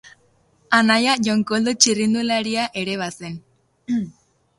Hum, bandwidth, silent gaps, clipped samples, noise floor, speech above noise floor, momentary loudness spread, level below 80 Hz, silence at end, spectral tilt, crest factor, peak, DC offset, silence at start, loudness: none; 11.5 kHz; none; under 0.1%; -60 dBFS; 40 dB; 16 LU; -62 dBFS; 0.5 s; -3 dB/octave; 22 dB; 0 dBFS; under 0.1%; 0.7 s; -19 LUFS